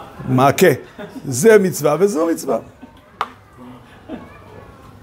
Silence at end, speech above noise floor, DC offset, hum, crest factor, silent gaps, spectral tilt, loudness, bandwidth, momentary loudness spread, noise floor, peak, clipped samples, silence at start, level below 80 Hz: 0.45 s; 25 dB; under 0.1%; none; 18 dB; none; -5.5 dB/octave; -16 LUFS; 16.5 kHz; 22 LU; -40 dBFS; 0 dBFS; under 0.1%; 0 s; -52 dBFS